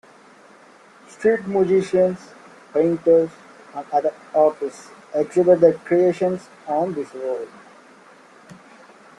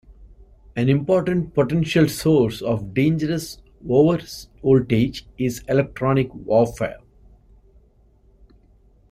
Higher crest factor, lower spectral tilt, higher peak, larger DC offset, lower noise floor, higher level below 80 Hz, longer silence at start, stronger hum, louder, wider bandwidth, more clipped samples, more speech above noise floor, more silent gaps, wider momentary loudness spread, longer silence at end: about the same, 20 dB vs 18 dB; about the same, -7.5 dB/octave vs -7 dB/octave; about the same, -2 dBFS vs -4 dBFS; neither; second, -49 dBFS vs -55 dBFS; second, -64 dBFS vs -46 dBFS; first, 1.2 s vs 0.1 s; neither; about the same, -20 LUFS vs -20 LUFS; second, 11 kHz vs 16 kHz; neither; second, 29 dB vs 35 dB; neither; first, 14 LU vs 10 LU; second, 1.7 s vs 2.15 s